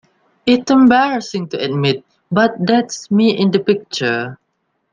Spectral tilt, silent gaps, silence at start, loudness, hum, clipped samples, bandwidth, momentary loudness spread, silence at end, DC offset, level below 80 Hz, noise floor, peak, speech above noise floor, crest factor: -5.5 dB/octave; none; 0.45 s; -15 LUFS; none; under 0.1%; 9.2 kHz; 11 LU; 0.6 s; under 0.1%; -58 dBFS; -68 dBFS; 0 dBFS; 54 dB; 16 dB